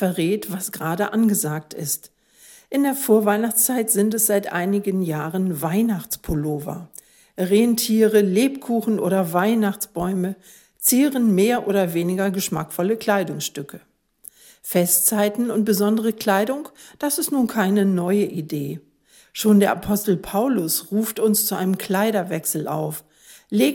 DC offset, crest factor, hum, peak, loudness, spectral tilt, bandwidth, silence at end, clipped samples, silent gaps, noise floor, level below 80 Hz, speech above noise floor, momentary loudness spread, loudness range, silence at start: under 0.1%; 16 dB; none; -4 dBFS; -20 LUFS; -4.5 dB/octave; 17.5 kHz; 0 s; under 0.1%; none; -50 dBFS; -52 dBFS; 29 dB; 11 LU; 3 LU; 0 s